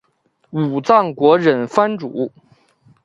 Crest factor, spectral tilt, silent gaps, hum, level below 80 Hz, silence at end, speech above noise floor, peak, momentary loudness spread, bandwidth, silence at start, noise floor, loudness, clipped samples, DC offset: 18 dB; -7 dB/octave; none; none; -64 dBFS; 0.75 s; 47 dB; 0 dBFS; 12 LU; 8 kHz; 0.55 s; -63 dBFS; -16 LUFS; under 0.1%; under 0.1%